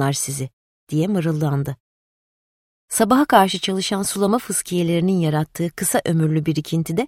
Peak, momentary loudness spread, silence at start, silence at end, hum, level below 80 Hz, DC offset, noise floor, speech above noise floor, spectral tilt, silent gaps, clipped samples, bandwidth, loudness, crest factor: -2 dBFS; 10 LU; 0 s; 0 s; none; -54 dBFS; under 0.1%; under -90 dBFS; over 71 dB; -5 dB/octave; 0.53-0.87 s, 1.80-2.88 s; under 0.1%; 16.5 kHz; -20 LUFS; 20 dB